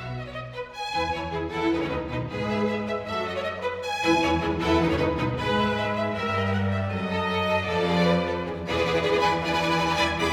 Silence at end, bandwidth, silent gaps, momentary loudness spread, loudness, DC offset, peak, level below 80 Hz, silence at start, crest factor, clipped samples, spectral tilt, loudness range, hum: 0 s; 16 kHz; none; 7 LU; -25 LUFS; under 0.1%; -10 dBFS; -44 dBFS; 0 s; 16 dB; under 0.1%; -5.5 dB/octave; 4 LU; none